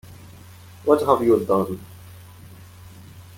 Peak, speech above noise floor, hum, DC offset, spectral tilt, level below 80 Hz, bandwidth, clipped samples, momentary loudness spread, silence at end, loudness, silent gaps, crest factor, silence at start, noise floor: -2 dBFS; 25 dB; none; under 0.1%; -7.5 dB/octave; -58 dBFS; 17 kHz; under 0.1%; 22 LU; 0.15 s; -20 LUFS; none; 22 dB; 0.1 s; -44 dBFS